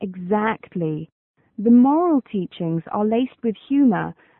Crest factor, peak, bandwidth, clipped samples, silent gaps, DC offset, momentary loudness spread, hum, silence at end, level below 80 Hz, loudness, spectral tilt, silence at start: 14 dB; -6 dBFS; 3.9 kHz; under 0.1%; 1.12-1.34 s; under 0.1%; 12 LU; none; 0.3 s; -62 dBFS; -20 LUFS; -12.5 dB/octave; 0 s